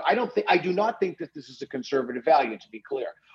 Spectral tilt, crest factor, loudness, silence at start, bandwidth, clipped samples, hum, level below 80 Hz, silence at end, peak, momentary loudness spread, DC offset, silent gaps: -5.5 dB/octave; 18 dB; -26 LUFS; 0 s; 7.4 kHz; under 0.1%; none; -76 dBFS; 0.25 s; -8 dBFS; 16 LU; under 0.1%; none